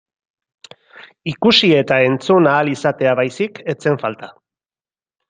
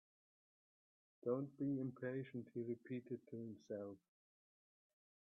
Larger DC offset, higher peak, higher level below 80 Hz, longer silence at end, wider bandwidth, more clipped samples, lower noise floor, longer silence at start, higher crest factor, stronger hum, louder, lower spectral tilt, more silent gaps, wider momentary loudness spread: neither; first, 0 dBFS vs -30 dBFS; first, -60 dBFS vs under -90 dBFS; second, 1 s vs 1.3 s; first, 9.6 kHz vs 6.4 kHz; neither; about the same, under -90 dBFS vs under -90 dBFS; second, 1 s vs 1.25 s; about the same, 16 dB vs 20 dB; neither; first, -15 LUFS vs -47 LUFS; second, -5.5 dB/octave vs -9 dB/octave; neither; first, 13 LU vs 9 LU